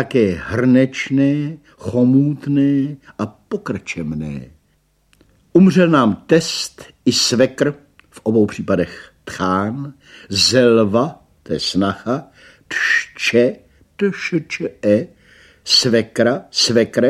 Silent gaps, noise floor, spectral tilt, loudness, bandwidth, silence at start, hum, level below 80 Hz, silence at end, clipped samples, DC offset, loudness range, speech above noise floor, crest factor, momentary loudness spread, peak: none; -60 dBFS; -4.5 dB/octave; -17 LUFS; 14.5 kHz; 0 s; none; -52 dBFS; 0 s; under 0.1%; under 0.1%; 4 LU; 44 dB; 16 dB; 14 LU; 0 dBFS